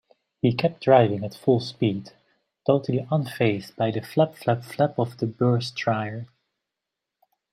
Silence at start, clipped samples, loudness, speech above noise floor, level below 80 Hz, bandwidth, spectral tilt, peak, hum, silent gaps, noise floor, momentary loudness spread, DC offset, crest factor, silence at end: 0.45 s; under 0.1%; -24 LUFS; 62 dB; -66 dBFS; 14.5 kHz; -7.5 dB/octave; -4 dBFS; none; none; -85 dBFS; 9 LU; under 0.1%; 20 dB; 1.3 s